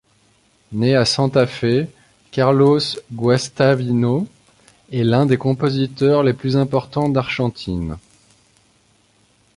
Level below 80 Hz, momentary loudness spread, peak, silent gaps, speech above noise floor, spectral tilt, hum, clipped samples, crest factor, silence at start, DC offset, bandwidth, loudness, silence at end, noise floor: -46 dBFS; 11 LU; -2 dBFS; none; 41 dB; -6.5 dB/octave; none; under 0.1%; 16 dB; 0.7 s; under 0.1%; 11.5 kHz; -18 LUFS; 1.55 s; -58 dBFS